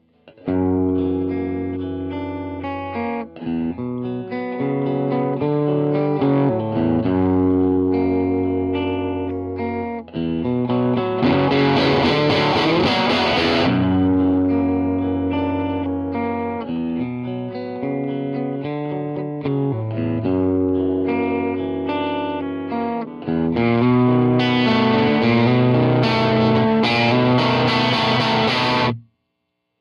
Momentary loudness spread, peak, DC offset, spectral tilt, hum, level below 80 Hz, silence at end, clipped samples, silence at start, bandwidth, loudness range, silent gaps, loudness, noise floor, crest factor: 10 LU; -6 dBFS; under 0.1%; -7.5 dB/octave; none; -48 dBFS; 0.8 s; under 0.1%; 0.25 s; 7.2 kHz; 8 LU; none; -19 LUFS; -74 dBFS; 14 dB